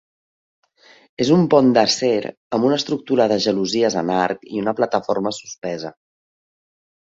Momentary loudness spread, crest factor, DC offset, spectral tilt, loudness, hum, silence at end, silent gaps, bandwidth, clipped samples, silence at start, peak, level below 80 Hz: 13 LU; 18 dB; under 0.1%; -5 dB/octave; -19 LUFS; none; 1.2 s; 2.37-2.50 s, 5.58-5.62 s; 8 kHz; under 0.1%; 1.2 s; -2 dBFS; -60 dBFS